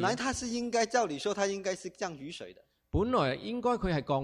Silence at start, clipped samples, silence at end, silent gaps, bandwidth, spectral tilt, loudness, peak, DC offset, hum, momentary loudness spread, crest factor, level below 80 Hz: 0 s; under 0.1%; 0 s; none; 14 kHz; -4.5 dB/octave; -32 LUFS; -14 dBFS; under 0.1%; none; 11 LU; 18 dB; -50 dBFS